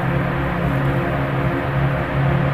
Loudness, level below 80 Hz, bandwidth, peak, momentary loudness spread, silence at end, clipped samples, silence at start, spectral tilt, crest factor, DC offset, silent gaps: -20 LUFS; -32 dBFS; 5.2 kHz; -6 dBFS; 2 LU; 0 s; under 0.1%; 0 s; -8.5 dB/octave; 12 dB; under 0.1%; none